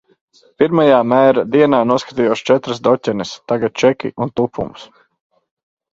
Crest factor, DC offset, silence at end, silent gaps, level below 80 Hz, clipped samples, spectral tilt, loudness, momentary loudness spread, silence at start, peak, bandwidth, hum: 16 dB; under 0.1%; 1.1 s; none; -54 dBFS; under 0.1%; -6 dB/octave; -15 LUFS; 10 LU; 0.6 s; 0 dBFS; 7.8 kHz; none